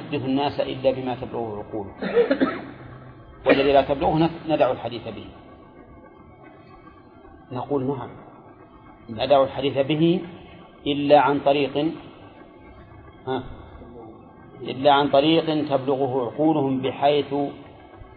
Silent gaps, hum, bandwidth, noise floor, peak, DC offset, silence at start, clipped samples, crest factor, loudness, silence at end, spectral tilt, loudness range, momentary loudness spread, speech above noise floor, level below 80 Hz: none; none; 5.2 kHz; -47 dBFS; -4 dBFS; under 0.1%; 0 s; under 0.1%; 20 dB; -22 LUFS; 0.1 s; -9.5 dB/octave; 12 LU; 22 LU; 26 dB; -52 dBFS